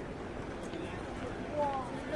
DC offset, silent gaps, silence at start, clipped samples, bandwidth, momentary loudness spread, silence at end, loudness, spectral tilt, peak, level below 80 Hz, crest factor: under 0.1%; none; 0 s; under 0.1%; 11.5 kHz; 7 LU; 0 s; -39 LUFS; -6 dB/octave; -22 dBFS; -52 dBFS; 16 dB